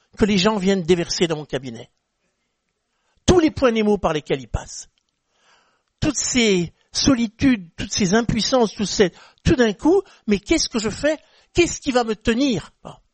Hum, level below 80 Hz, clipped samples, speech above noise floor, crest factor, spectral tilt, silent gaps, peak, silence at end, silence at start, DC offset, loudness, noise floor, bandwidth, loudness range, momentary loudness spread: none; -38 dBFS; under 0.1%; 54 dB; 20 dB; -4.5 dB/octave; none; -2 dBFS; 0.2 s; 0.2 s; under 0.1%; -20 LUFS; -73 dBFS; 8.8 kHz; 3 LU; 10 LU